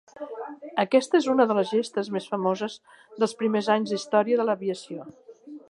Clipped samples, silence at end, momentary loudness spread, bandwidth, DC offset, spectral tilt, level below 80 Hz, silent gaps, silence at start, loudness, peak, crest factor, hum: under 0.1%; 0.15 s; 18 LU; 11.5 kHz; under 0.1%; -5 dB/octave; -78 dBFS; none; 0.15 s; -25 LUFS; -6 dBFS; 18 dB; none